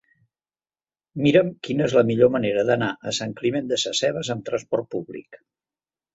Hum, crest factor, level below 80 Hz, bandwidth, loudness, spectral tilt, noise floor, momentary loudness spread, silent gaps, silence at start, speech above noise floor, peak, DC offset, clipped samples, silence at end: none; 20 dB; -60 dBFS; 8 kHz; -22 LUFS; -5 dB/octave; under -90 dBFS; 12 LU; none; 1.15 s; over 68 dB; -4 dBFS; under 0.1%; under 0.1%; 0.8 s